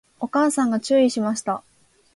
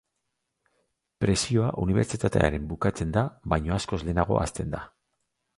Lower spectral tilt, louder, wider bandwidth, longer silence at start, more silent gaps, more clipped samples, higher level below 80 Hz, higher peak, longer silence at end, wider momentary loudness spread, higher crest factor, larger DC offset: second, -4.5 dB/octave vs -6 dB/octave; first, -21 LUFS vs -27 LUFS; about the same, 11.5 kHz vs 11.5 kHz; second, 0.2 s vs 1.2 s; neither; neither; second, -68 dBFS vs -40 dBFS; about the same, -8 dBFS vs -6 dBFS; second, 0.55 s vs 0.7 s; first, 9 LU vs 6 LU; second, 14 dB vs 20 dB; neither